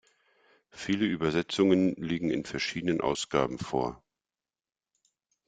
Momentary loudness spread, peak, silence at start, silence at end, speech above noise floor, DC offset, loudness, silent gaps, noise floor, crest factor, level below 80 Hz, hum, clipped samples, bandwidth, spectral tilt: 8 LU; -10 dBFS; 0.75 s; 1.5 s; over 62 dB; under 0.1%; -29 LUFS; none; under -90 dBFS; 20 dB; -60 dBFS; none; under 0.1%; 9.4 kHz; -5.5 dB/octave